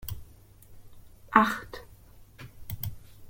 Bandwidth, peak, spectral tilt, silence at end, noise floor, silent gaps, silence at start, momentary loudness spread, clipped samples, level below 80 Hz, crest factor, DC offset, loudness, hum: 16.5 kHz; -2 dBFS; -5.5 dB/octave; 0 s; -53 dBFS; none; 0 s; 24 LU; under 0.1%; -52 dBFS; 30 dB; under 0.1%; -28 LUFS; none